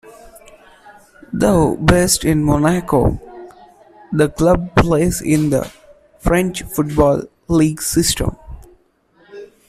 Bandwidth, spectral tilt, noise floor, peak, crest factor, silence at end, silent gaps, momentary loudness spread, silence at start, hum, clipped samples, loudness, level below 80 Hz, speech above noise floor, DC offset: 15.5 kHz; -5.5 dB/octave; -55 dBFS; -2 dBFS; 16 dB; 0.25 s; none; 10 LU; 0.05 s; none; under 0.1%; -16 LUFS; -32 dBFS; 40 dB; under 0.1%